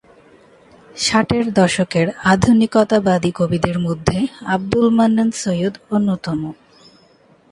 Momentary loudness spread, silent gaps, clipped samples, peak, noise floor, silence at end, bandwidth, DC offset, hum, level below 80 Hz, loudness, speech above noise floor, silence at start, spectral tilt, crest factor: 8 LU; none; under 0.1%; 0 dBFS; -52 dBFS; 1 s; 11.5 kHz; under 0.1%; none; -42 dBFS; -17 LUFS; 35 dB; 0.95 s; -5.5 dB/octave; 18 dB